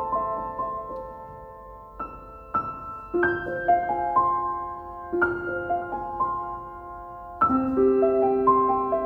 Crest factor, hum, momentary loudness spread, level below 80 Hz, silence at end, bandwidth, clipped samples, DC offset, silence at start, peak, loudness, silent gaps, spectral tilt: 16 dB; none; 18 LU; -50 dBFS; 0 s; 4.3 kHz; under 0.1%; under 0.1%; 0 s; -8 dBFS; -25 LUFS; none; -9 dB/octave